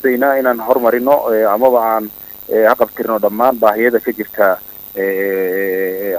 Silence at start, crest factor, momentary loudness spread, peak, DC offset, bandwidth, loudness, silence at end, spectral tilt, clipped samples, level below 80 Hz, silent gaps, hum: 0 s; 14 dB; 8 LU; 0 dBFS; under 0.1%; 16.5 kHz; -14 LUFS; 0 s; -6 dB/octave; under 0.1%; -56 dBFS; none; none